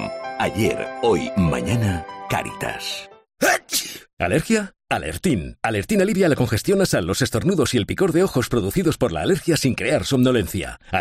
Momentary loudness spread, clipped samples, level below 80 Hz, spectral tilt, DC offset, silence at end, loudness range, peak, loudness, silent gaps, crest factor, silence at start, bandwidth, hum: 8 LU; under 0.1%; -44 dBFS; -5 dB/octave; under 0.1%; 0 s; 3 LU; -6 dBFS; -21 LUFS; 4.13-4.17 s; 14 dB; 0 s; 15.5 kHz; none